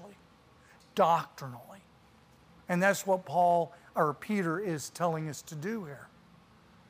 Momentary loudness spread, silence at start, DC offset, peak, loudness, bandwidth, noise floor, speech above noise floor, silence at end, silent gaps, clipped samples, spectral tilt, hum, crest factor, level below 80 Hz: 18 LU; 0 s; under 0.1%; -12 dBFS; -31 LUFS; 15.5 kHz; -60 dBFS; 30 dB; 0.85 s; none; under 0.1%; -5.5 dB/octave; none; 20 dB; -72 dBFS